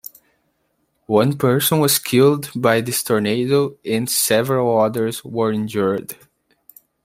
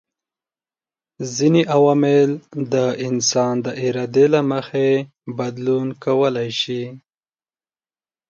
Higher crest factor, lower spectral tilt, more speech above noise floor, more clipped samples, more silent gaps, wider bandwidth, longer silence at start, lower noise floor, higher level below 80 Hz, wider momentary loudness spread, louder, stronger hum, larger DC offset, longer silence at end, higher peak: about the same, 18 dB vs 18 dB; about the same, -4.5 dB/octave vs -5 dB/octave; second, 50 dB vs over 72 dB; neither; neither; first, 16 kHz vs 7.6 kHz; about the same, 1.1 s vs 1.2 s; second, -68 dBFS vs under -90 dBFS; first, -60 dBFS vs -66 dBFS; second, 7 LU vs 12 LU; about the same, -18 LUFS vs -19 LUFS; neither; neither; second, 0.9 s vs 1.3 s; about the same, -2 dBFS vs -2 dBFS